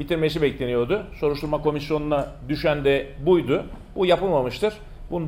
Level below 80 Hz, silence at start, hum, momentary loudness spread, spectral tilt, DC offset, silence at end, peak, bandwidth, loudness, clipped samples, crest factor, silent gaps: -40 dBFS; 0 s; none; 6 LU; -7 dB/octave; under 0.1%; 0 s; -6 dBFS; 16.5 kHz; -23 LUFS; under 0.1%; 16 dB; none